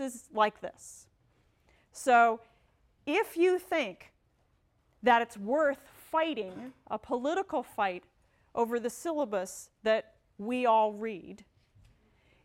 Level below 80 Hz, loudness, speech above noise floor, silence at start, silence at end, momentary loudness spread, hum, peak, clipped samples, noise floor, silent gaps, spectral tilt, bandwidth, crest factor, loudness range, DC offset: -70 dBFS; -30 LUFS; 41 dB; 0 s; 1.1 s; 17 LU; none; -12 dBFS; under 0.1%; -71 dBFS; none; -4 dB/octave; 16.5 kHz; 20 dB; 4 LU; under 0.1%